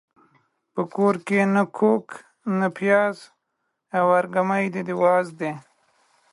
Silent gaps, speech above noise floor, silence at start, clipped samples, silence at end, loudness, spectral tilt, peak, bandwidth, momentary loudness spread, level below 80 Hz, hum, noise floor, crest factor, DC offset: none; 55 dB; 0.75 s; under 0.1%; 0.7 s; -22 LUFS; -7.5 dB/octave; -6 dBFS; 11.5 kHz; 12 LU; -74 dBFS; none; -77 dBFS; 16 dB; under 0.1%